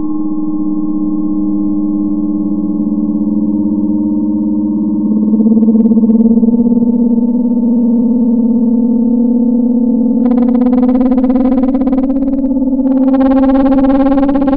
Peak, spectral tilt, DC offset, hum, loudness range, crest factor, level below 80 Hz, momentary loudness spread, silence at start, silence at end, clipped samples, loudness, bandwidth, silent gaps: 0 dBFS; -13.5 dB/octave; under 0.1%; none; 4 LU; 10 dB; -32 dBFS; 6 LU; 0 s; 0 s; under 0.1%; -11 LUFS; 3.9 kHz; none